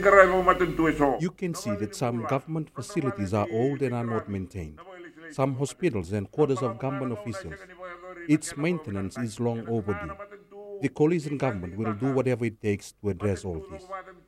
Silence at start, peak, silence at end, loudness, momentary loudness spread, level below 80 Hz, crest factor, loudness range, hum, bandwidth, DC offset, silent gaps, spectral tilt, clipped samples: 0 s; -2 dBFS; 0.15 s; -27 LUFS; 16 LU; -52 dBFS; 26 dB; 3 LU; none; 16.5 kHz; under 0.1%; none; -6.5 dB/octave; under 0.1%